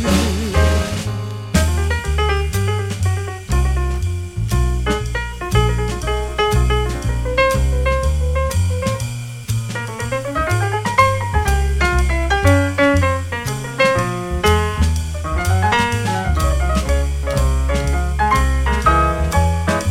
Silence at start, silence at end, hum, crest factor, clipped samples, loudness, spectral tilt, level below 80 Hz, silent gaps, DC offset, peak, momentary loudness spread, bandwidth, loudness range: 0 s; 0 s; none; 16 dB; under 0.1%; -18 LUFS; -5.5 dB/octave; -22 dBFS; none; under 0.1%; 0 dBFS; 8 LU; 15.5 kHz; 3 LU